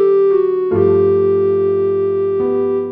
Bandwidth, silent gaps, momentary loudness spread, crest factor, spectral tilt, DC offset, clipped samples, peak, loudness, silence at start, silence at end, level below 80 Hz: 3.7 kHz; none; 4 LU; 10 dB; -11.5 dB/octave; under 0.1%; under 0.1%; -4 dBFS; -14 LUFS; 0 s; 0 s; -56 dBFS